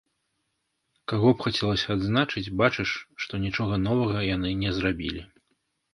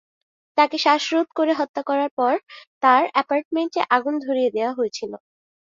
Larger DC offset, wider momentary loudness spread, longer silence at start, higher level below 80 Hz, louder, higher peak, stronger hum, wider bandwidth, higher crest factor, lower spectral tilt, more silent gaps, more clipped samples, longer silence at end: neither; about the same, 9 LU vs 9 LU; first, 1.1 s vs 0.55 s; first, -46 dBFS vs -72 dBFS; second, -26 LUFS vs -21 LUFS; about the same, -4 dBFS vs -2 dBFS; neither; first, 11.5 kHz vs 7.6 kHz; about the same, 22 dB vs 20 dB; first, -6.5 dB/octave vs -3 dB/octave; second, none vs 1.69-1.74 s, 2.11-2.17 s, 2.67-2.81 s, 3.45-3.51 s; neither; first, 0.7 s vs 0.5 s